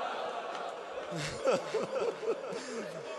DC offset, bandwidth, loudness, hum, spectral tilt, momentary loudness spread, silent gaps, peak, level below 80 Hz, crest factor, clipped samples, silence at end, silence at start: under 0.1%; 12 kHz; -36 LUFS; none; -4 dB/octave; 8 LU; none; -18 dBFS; -68 dBFS; 18 dB; under 0.1%; 0 s; 0 s